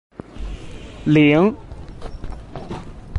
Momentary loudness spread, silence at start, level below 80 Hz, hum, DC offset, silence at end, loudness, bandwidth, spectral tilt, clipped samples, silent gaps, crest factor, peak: 23 LU; 0.3 s; -36 dBFS; none; under 0.1%; 0 s; -16 LUFS; 9 kHz; -8 dB/octave; under 0.1%; none; 18 dB; -4 dBFS